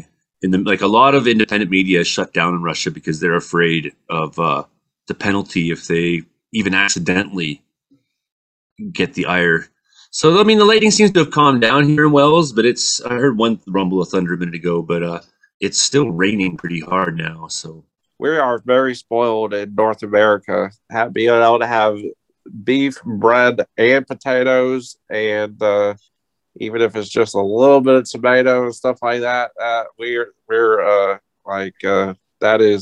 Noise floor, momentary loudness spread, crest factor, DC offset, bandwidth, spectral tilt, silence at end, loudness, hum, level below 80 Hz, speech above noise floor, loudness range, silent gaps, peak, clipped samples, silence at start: -60 dBFS; 13 LU; 16 dB; under 0.1%; 9.8 kHz; -4.5 dB/octave; 0 s; -16 LUFS; none; -56 dBFS; 44 dB; 6 LU; 8.32-8.76 s, 15.54-15.60 s; 0 dBFS; under 0.1%; 0.4 s